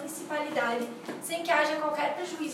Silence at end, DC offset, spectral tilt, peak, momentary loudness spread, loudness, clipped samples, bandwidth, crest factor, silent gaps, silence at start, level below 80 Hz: 0 s; under 0.1%; -2.5 dB/octave; -12 dBFS; 9 LU; -30 LUFS; under 0.1%; 16 kHz; 18 dB; none; 0 s; -88 dBFS